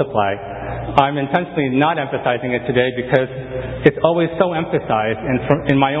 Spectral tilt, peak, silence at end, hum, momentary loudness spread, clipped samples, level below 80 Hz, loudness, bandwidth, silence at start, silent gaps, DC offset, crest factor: -8.5 dB/octave; 0 dBFS; 0 s; none; 7 LU; under 0.1%; -42 dBFS; -18 LUFS; 7.6 kHz; 0 s; none; under 0.1%; 18 dB